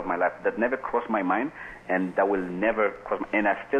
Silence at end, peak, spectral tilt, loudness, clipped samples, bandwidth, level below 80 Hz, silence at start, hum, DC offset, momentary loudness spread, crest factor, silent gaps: 0 s; -10 dBFS; -7.5 dB/octave; -26 LUFS; under 0.1%; 9.2 kHz; -56 dBFS; 0 s; none; under 0.1%; 4 LU; 16 dB; none